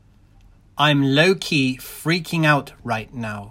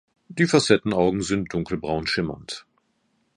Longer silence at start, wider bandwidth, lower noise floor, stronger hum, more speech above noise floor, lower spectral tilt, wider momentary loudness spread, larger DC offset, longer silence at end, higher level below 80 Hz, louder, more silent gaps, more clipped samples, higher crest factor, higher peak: first, 0.75 s vs 0.3 s; first, 16.5 kHz vs 11 kHz; second, -51 dBFS vs -69 dBFS; neither; second, 31 dB vs 47 dB; about the same, -5 dB/octave vs -5 dB/octave; second, 12 LU vs 17 LU; neither; second, 0 s vs 0.75 s; about the same, -52 dBFS vs -50 dBFS; first, -20 LUFS vs -23 LUFS; neither; neither; about the same, 20 dB vs 22 dB; about the same, 0 dBFS vs -2 dBFS